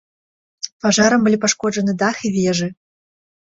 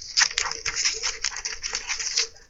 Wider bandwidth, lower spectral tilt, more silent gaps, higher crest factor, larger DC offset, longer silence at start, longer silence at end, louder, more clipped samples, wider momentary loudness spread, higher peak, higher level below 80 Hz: second, 8 kHz vs 15 kHz; first, -4 dB/octave vs 2.5 dB/octave; first, 0.72-0.80 s vs none; second, 18 dB vs 28 dB; neither; first, 0.65 s vs 0 s; first, 0.7 s vs 0.05 s; first, -17 LUFS vs -24 LUFS; neither; first, 12 LU vs 8 LU; about the same, -2 dBFS vs 0 dBFS; second, -56 dBFS vs -48 dBFS